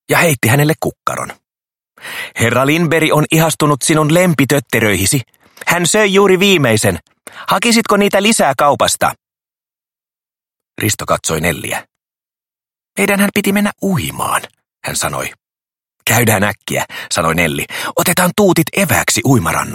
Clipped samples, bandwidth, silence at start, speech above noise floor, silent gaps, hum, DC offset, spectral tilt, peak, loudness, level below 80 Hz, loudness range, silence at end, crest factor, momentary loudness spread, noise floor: under 0.1%; 17 kHz; 0.1 s; over 77 dB; none; none; under 0.1%; -4 dB/octave; 0 dBFS; -13 LUFS; -44 dBFS; 6 LU; 0 s; 14 dB; 10 LU; under -90 dBFS